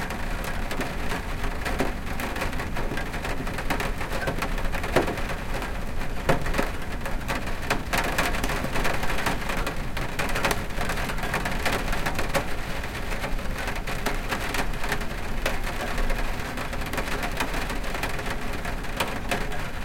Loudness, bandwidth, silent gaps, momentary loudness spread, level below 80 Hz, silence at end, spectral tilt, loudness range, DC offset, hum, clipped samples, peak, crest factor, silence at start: -29 LUFS; 17 kHz; none; 6 LU; -32 dBFS; 0 s; -4 dB/octave; 3 LU; under 0.1%; none; under 0.1%; -6 dBFS; 20 dB; 0 s